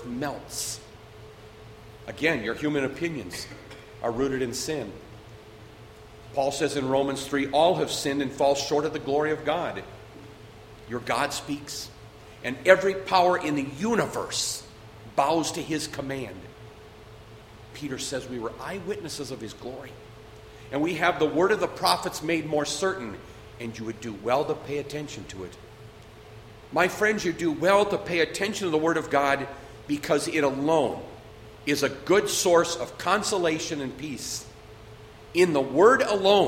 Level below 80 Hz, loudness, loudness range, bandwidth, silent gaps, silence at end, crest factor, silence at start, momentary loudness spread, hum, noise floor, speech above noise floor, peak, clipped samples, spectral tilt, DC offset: -54 dBFS; -26 LUFS; 8 LU; 16 kHz; none; 0 s; 26 dB; 0 s; 25 LU; none; -47 dBFS; 21 dB; -2 dBFS; under 0.1%; -4 dB/octave; under 0.1%